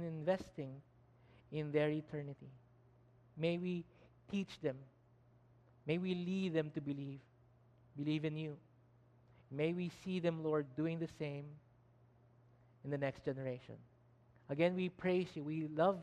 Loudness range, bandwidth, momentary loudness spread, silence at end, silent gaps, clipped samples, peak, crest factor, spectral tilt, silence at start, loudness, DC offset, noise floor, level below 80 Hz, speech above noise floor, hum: 4 LU; 9.6 kHz; 18 LU; 0 s; none; under 0.1%; -20 dBFS; 20 dB; -8 dB/octave; 0 s; -41 LUFS; under 0.1%; -68 dBFS; -76 dBFS; 29 dB; none